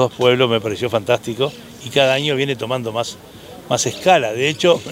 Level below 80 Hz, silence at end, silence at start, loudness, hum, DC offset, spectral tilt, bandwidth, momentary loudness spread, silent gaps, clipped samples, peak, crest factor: -58 dBFS; 0 s; 0 s; -18 LUFS; none; under 0.1%; -4 dB/octave; 16 kHz; 11 LU; none; under 0.1%; 0 dBFS; 18 dB